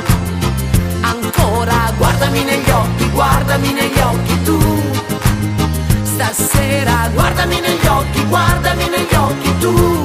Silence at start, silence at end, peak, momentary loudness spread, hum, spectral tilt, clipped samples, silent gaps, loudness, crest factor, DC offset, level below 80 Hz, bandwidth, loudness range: 0 s; 0 s; 0 dBFS; 3 LU; none; -5 dB/octave; under 0.1%; none; -14 LUFS; 14 dB; under 0.1%; -22 dBFS; 15.5 kHz; 1 LU